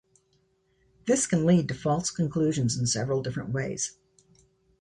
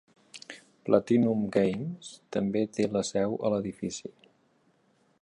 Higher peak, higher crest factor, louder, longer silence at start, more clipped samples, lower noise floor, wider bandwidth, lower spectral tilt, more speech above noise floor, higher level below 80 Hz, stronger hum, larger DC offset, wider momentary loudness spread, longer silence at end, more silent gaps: about the same, -10 dBFS vs -8 dBFS; about the same, 18 dB vs 22 dB; about the same, -27 LUFS vs -29 LUFS; first, 1.05 s vs 0.35 s; neither; about the same, -69 dBFS vs -68 dBFS; about the same, 11 kHz vs 11 kHz; about the same, -5 dB/octave vs -6 dB/octave; about the same, 43 dB vs 40 dB; first, -58 dBFS vs -66 dBFS; neither; neither; second, 8 LU vs 20 LU; second, 0.9 s vs 1.1 s; neither